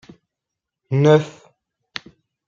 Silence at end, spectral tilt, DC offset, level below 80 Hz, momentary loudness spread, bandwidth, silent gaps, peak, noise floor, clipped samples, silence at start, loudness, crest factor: 1.2 s; -7.5 dB/octave; under 0.1%; -64 dBFS; 20 LU; 7.6 kHz; none; -2 dBFS; -84 dBFS; under 0.1%; 0.9 s; -17 LUFS; 20 dB